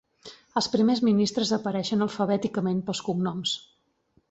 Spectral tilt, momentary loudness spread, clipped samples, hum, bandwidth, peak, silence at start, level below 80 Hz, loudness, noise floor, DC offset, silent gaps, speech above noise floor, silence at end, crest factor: -5.5 dB/octave; 7 LU; under 0.1%; none; 8.2 kHz; -10 dBFS; 0.25 s; -66 dBFS; -26 LUFS; -68 dBFS; under 0.1%; none; 43 dB; 0.7 s; 16 dB